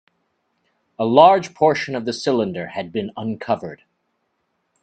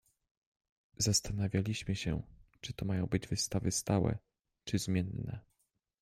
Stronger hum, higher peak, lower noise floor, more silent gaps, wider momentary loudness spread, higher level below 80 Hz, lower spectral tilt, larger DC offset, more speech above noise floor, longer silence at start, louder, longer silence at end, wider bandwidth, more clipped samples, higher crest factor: neither; first, 0 dBFS vs -16 dBFS; second, -71 dBFS vs -80 dBFS; neither; about the same, 15 LU vs 14 LU; second, -64 dBFS vs -54 dBFS; about the same, -5.5 dB/octave vs -4.5 dB/octave; neither; first, 53 dB vs 46 dB; about the same, 1 s vs 1 s; first, -19 LUFS vs -35 LUFS; first, 1.1 s vs 0.6 s; second, 9 kHz vs 15 kHz; neither; about the same, 20 dB vs 20 dB